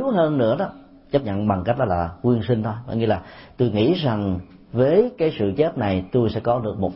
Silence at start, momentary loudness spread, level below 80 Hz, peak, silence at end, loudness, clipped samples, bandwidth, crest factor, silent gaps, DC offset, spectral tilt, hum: 0 s; 7 LU; -48 dBFS; -6 dBFS; 0 s; -22 LUFS; under 0.1%; 5.8 kHz; 16 dB; none; under 0.1%; -12 dB/octave; none